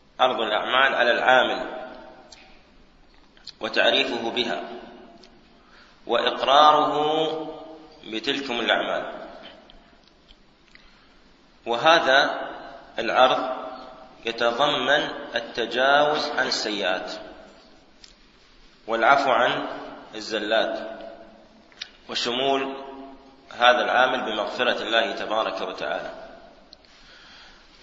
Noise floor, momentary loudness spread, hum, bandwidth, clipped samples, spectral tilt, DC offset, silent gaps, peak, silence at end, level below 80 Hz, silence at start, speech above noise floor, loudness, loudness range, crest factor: -54 dBFS; 22 LU; none; 7.8 kHz; under 0.1%; -3 dB/octave; under 0.1%; none; -2 dBFS; 0.4 s; -60 dBFS; 0.2 s; 32 dB; -22 LUFS; 6 LU; 24 dB